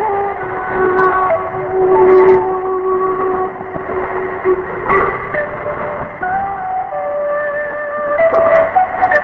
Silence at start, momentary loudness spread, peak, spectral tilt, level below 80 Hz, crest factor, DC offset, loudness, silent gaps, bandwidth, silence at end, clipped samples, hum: 0 s; 10 LU; 0 dBFS; -8.5 dB/octave; -42 dBFS; 14 dB; under 0.1%; -15 LUFS; none; 4.3 kHz; 0 s; under 0.1%; none